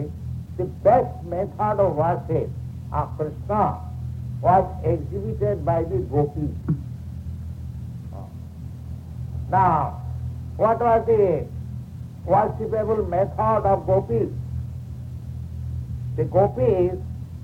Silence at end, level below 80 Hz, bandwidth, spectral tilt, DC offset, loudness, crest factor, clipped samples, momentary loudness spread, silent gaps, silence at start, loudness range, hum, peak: 0 s; -38 dBFS; 8.2 kHz; -10 dB/octave; under 0.1%; -23 LUFS; 18 dB; under 0.1%; 16 LU; none; 0 s; 5 LU; none; -6 dBFS